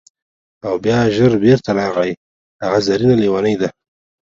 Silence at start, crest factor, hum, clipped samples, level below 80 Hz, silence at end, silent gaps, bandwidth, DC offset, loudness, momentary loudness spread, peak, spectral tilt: 0.65 s; 16 dB; none; under 0.1%; -48 dBFS; 0.5 s; 2.17-2.59 s; 7.6 kHz; under 0.1%; -16 LUFS; 10 LU; 0 dBFS; -7 dB/octave